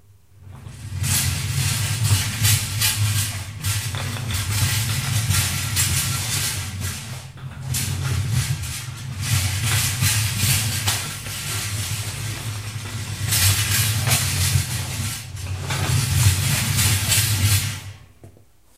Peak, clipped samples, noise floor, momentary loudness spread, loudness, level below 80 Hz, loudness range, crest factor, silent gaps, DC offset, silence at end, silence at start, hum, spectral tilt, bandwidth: -4 dBFS; under 0.1%; -52 dBFS; 12 LU; -21 LUFS; -40 dBFS; 3 LU; 18 dB; none; under 0.1%; 0.45 s; 0.4 s; none; -2.5 dB/octave; 16 kHz